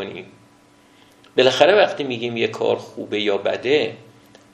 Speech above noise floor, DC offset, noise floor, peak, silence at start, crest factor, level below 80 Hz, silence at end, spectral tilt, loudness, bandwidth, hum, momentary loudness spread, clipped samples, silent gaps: 33 dB; under 0.1%; -52 dBFS; 0 dBFS; 0 s; 20 dB; -68 dBFS; 0.55 s; -4.5 dB/octave; -19 LUFS; 10.5 kHz; none; 13 LU; under 0.1%; none